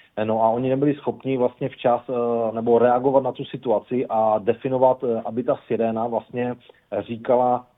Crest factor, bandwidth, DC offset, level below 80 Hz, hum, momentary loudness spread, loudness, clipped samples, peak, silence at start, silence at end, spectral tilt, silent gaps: 18 dB; 4 kHz; under 0.1%; -64 dBFS; none; 9 LU; -22 LUFS; under 0.1%; -4 dBFS; 0.15 s; 0.15 s; -10.5 dB/octave; none